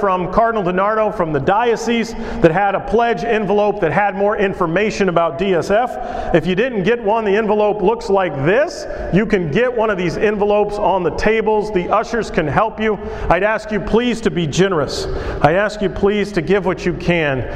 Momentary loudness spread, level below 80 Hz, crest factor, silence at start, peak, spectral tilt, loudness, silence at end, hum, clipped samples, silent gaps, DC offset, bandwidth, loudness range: 4 LU; -34 dBFS; 16 dB; 0 s; 0 dBFS; -6 dB/octave; -17 LUFS; 0 s; none; under 0.1%; none; under 0.1%; 11 kHz; 1 LU